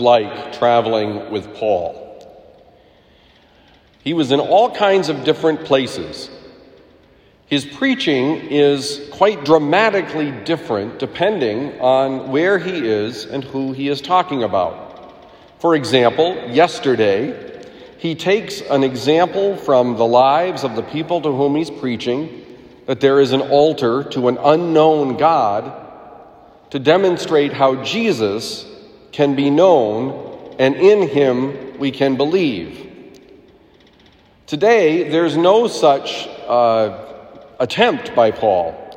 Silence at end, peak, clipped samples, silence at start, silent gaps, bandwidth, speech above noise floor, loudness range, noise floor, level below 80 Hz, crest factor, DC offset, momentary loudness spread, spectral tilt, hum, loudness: 0 s; 0 dBFS; under 0.1%; 0 s; none; 15 kHz; 35 dB; 4 LU; -50 dBFS; -58 dBFS; 16 dB; under 0.1%; 13 LU; -5.5 dB/octave; none; -16 LUFS